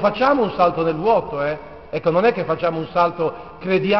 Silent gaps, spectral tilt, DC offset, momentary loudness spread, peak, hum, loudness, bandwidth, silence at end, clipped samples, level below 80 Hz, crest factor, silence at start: none; -4.5 dB/octave; 0.4%; 8 LU; -2 dBFS; none; -20 LUFS; 6.2 kHz; 0 s; under 0.1%; -50 dBFS; 16 dB; 0 s